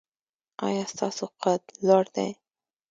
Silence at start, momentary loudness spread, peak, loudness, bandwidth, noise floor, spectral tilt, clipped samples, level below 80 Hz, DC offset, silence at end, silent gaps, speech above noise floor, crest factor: 0.6 s; 10 LU; -8 dBFS; -27 LUFS; 9.2 kHz; under -90 dBFS; -5 dB/octave; under 0.1%; -76 dBFS; under 0.1%; 0.6 s; none; over 64 dB; 20 dB